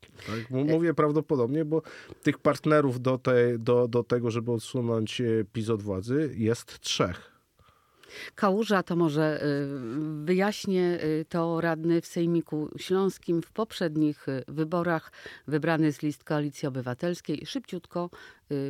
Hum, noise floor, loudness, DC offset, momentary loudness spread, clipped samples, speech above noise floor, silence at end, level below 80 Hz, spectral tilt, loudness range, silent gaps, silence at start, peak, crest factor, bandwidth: none; -63 dBFS; -28 LUFS; under 0.1%; 10 LU; under 0.1%; 35 dB; 0 s; -68 dBFS; -6.5 dB/octave; 4 LU; none; 0.2 s; -10 dBFS; 18 dB; 15.5 kHz